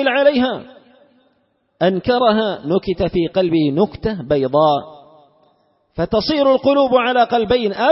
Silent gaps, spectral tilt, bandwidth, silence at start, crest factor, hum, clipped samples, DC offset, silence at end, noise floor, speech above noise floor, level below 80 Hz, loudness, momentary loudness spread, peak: none; -10 dB/octave; 5.8 kHz; 0 s; 16 dB; none; under 0.1%; under 0.1%; 0 s; -63 dBFS; 48 dB; -44 dBFS; -16 LUFS; 6 LU; -2 dBFS